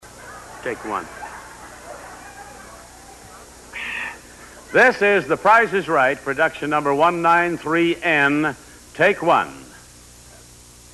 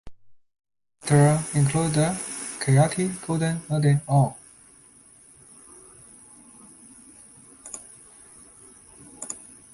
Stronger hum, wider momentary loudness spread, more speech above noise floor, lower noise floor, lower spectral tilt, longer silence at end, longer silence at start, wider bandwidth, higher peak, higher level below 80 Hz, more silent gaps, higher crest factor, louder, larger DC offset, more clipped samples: first, 60 Hz at -50 dBFS vs none; about the same, 24 LU vs 26 LU; second, 27 dB vs 32 dB; second, -45 dBFS vs -53 dBFS; second, -4.5 dB/octave vs -6 dB/octave; first, 1.3 s vs 0.35 s; about the same, 0.05 s vs 0.05 s; about the same, 12.5 kHz vs 11.5 kHz; about the same, -6 dBFS vs -6 dBFS; about the same, -52 dBFS vs -56 dBFS; neither; about the same, 16 dB vs 20 dB; first, -18 LUFS vs -23 LUFS; neither; neither